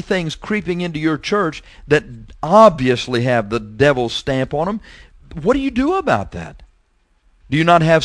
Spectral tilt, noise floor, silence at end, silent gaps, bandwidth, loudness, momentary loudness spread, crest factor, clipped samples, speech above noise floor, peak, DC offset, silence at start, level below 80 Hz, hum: -6 dB/octave; -59 dBFS; 0 s; none; 11 kHz; -17 LUFS; 14 LU; 18 dB; under 0.1%; 42 dB; 0 dBFS; under 0.1%; 0.05 s; -40 dBFS; none